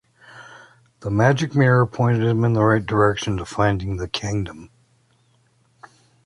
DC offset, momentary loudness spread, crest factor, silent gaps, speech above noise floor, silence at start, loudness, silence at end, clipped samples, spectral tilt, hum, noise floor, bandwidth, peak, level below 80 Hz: under 0.1%; 11 LU; 18 dB; none; 42 dB; 0.35 s; -20 LUFS; 1.6 s; under 0.1%; -6.5 dB/octave; none; -61 dBFS; 11 kHz; -4 dBFS; -44 dBFS